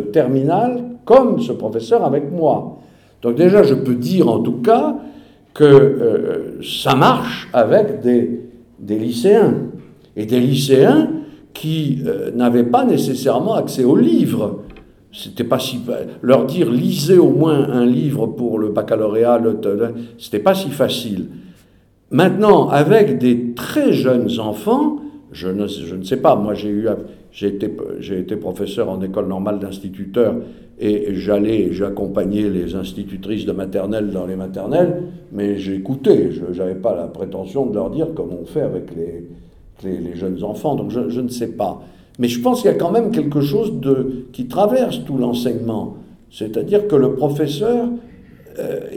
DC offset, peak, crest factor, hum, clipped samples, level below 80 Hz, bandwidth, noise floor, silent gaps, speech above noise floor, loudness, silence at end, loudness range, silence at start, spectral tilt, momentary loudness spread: under 0.1%; 0 dBFS; 16 dB; none; under 0.1%; -48 dBFS; 17 kHz; -52 dBFS; none; 36 dB; -17 LUFS; 0 s; 7 LU; 0 s; -7 dB/octave; 14 LU